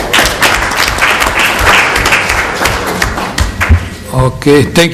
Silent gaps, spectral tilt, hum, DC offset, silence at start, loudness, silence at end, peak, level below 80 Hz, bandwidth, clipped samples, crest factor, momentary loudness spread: none; -3.5 dB/octave; none; under 0.1%; 0 s; -9 LUFS; 0 s; 0 dBFS; -20 dBFS; 20 kHz; 0.9%; 10 dB; 7 LU